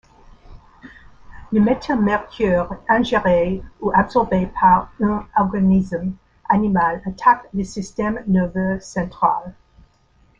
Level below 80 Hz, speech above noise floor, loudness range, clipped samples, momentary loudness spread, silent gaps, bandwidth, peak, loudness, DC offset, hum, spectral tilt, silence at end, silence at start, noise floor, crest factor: -42 dBFS; 38 dB; 3 LU; under 0.1%; 9 LU; none; 7.8 kHz; -2 dBFS; -19 LUFS; under 0.1%; none; -7.5 dB/octave; 0.9 s; 0.5 s; -56 dBFS; 18 dB